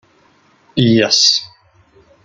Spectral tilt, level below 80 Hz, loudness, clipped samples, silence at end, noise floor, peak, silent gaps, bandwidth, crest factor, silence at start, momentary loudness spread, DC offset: -3.5 dB/octave; -56 dBFS; -12 LUFS; under 0.1%; 0.8 s; -53 dBFS; 0 dBFS; none; 12 kHz; 16 dB; 0.75 s; 9 LU; under 0.1%